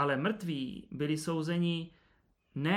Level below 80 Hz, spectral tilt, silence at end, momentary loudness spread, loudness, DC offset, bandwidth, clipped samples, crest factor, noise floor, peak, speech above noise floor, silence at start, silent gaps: -68 dBFS; -6 dB/octave; 0 s; 9 LU; -34 LUFS; under 0.1%; 14 kHz; under 0.1%; 18 dB; -71 dBFS; -16 dBFS; 37 dB; 0 s; none